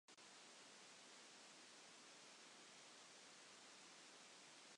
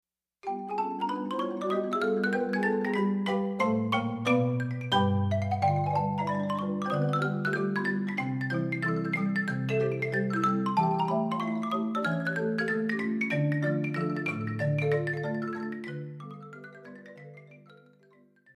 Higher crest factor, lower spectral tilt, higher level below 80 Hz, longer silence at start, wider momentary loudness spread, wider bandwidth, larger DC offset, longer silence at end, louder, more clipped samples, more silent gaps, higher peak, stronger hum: second, 12 dB vs 18 dB; second, -0.5 dB/octave vs -7.5 dB/octave; second, under -90 dBFS vs -70 dBFS; second, 0.1 s vs 0.45 s; second, 0 LU vs 11 LU; about the same, 11 kHz vs 11.5 kHz; neither; second, 0 s vs 0.85 s; second, -62 LUFS vs -29 LUFS; neither; neither; second, -52 dBFS vs -12 dBFS; neither